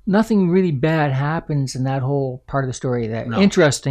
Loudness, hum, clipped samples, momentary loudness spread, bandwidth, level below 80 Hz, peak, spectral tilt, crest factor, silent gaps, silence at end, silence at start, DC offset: -19 LUFS; none; under 0.1%; 7 LU; 13 kHz; -46 dBFS; -6 dBFS; -6.5 dB/octave; 14 dB; none; 0 s; 0.05 s; under 0.1%